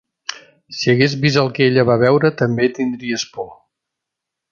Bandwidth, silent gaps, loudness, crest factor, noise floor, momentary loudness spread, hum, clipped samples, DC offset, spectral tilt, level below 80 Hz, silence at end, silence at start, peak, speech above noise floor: 7.4 kHz; none; -16 LUFS; 16 dB; -82 dBFS; 16 LU; none; under 0.1%; under 0.1%; -5.5 dB/octave; -56 dBFS; 1 s; 0.3 s; -2 dBFS; 66 dB